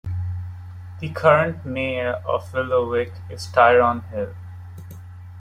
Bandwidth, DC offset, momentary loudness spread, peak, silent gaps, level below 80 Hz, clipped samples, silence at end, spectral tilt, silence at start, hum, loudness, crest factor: 14 kHz; under 0.1%; 23 LU; -2 dBFS; none; -52 dBFS; under 0.1%; 0 s; -6.5 dB/octave; 0.05 s; none; -21 LUFS; 20 dB